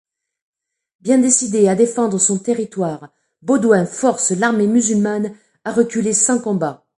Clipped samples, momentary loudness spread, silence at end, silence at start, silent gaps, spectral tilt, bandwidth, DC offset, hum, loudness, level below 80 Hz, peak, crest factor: under 0.1%; 10 LU; 0.25 s; 1.05 s; none; -4.5 dB/octave; 11.5 kHz; under 0.1%; none; -16 LUFS; -64 dBFS; 0 dBFS; 16 dB